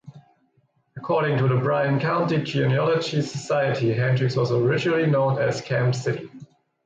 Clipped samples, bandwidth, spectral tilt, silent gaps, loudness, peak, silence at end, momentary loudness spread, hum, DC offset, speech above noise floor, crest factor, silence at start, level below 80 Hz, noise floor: under 0.1%; 8 kHz; -7 dB/octave; none; -22 LUFS; -10 dBFS; 0.4 s; 6 LU; none; under 0.1%; 44 dB; 12 dB; 0.05 s; -60 dBFS; -66 dBFS